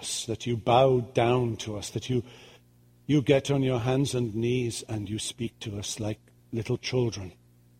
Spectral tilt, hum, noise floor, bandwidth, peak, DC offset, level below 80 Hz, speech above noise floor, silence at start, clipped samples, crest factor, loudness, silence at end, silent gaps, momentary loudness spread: -5.5 dB/octave; none; -59 dBFS; 15.5 kHz; -6 dBFS; under 0.1%; -56 dBFS; 32 dB; 0 s; under 0.1%; 22 dB; -28 LUFS; 0.5 s; none; 12 LU